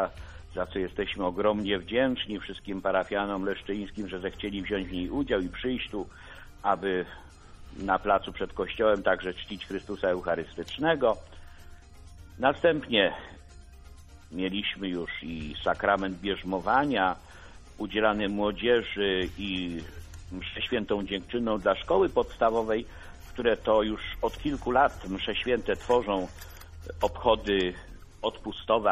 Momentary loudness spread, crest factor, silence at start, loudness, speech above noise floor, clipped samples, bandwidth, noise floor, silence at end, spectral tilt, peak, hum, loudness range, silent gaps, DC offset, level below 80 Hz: 13 LU; 20 dB; 0 s; -29 LUFS; 20 dB; under 0.1%; 13.5 kHz; -49 dBFS; 0 s; -5.5 dB/octave; -8 dBFS; none; 4 LU; none; under 0.1%; -48 dBFS